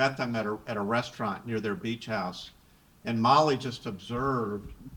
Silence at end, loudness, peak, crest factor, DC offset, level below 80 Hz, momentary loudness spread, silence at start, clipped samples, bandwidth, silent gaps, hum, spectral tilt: 0 s; -30 LUFS; -8 dBFS; 22 dB; under 0.1%; -56 dBFS; 15 LU; 0 s; under 0.1%; 19.5 kHz; none; none; -6 dB/octave